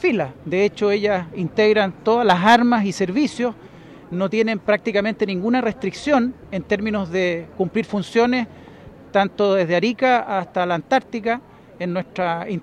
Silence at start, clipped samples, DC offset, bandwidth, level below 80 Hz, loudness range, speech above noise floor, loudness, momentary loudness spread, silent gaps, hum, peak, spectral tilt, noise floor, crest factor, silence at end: 0 s; under 0.1%; under 0.1%; 11.5 kHz; -54 dBFS; 4 LU; 22 dB; -20 LUFS; 9 LU; none; none; -4 dBFS; -6 dB/octave; -42 dBFS; 16 dB; 0 s